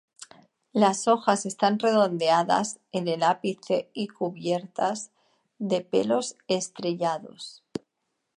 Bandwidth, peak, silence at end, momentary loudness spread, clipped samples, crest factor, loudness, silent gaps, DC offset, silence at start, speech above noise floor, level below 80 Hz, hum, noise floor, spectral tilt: 11.5 kHz; -6 dBFS; 0.6 s; 14 LU; under 0.1%; 20 dB; -26 LUFS; none; under 0.1%; 0.2 s; 54 dB; -74 dBFS; none; -79 dBFS; -4.5 dB/octave